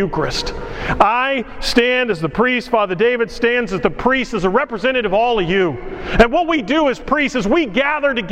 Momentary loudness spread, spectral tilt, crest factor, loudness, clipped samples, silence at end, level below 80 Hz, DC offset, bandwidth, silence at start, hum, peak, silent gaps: 7 LU; -5 dB/octave; 16 dB; -17 LUFS; under 0.1%; 0 s; -32 dBFS; under 0.1%; 15.5 kHz; 0 s; none; 0 dBFS; none